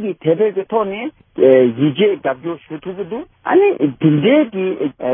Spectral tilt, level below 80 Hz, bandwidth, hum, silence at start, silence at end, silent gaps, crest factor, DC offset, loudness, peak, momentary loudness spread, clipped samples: -11.5 dB/octave; -60 dBFS; 3.6 kHz; none; 0 s; 0 s; none; 16 dB; under 0.1%; -15 LUFS; 0 dBFS; 14 LU; under 0.1%